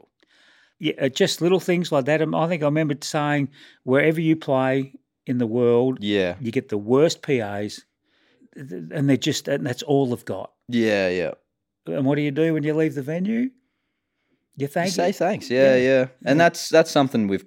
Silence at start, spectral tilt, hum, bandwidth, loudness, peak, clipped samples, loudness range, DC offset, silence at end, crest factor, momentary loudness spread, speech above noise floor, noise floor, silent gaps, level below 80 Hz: 0.8 s; -5.5 dB/octave; none; 17 kHz; -22 LUFS; -4 dBFS; under 0.1%; 4 LU; under 0.1%; 0.05 s; 18 dB; 13 LU; 55 dB; -76 dBFS; none; -70 dBFS